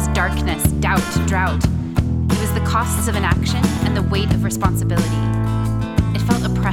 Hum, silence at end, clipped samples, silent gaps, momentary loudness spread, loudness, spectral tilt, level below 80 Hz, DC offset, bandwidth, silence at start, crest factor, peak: none; 0 s; under 0.1%; none; 2 LU; -19 LUFS; -5.5 dB/octave; -28 dBFS; under 0.1%; 17 kHz; 0 s; 16 dB; -2 dBFS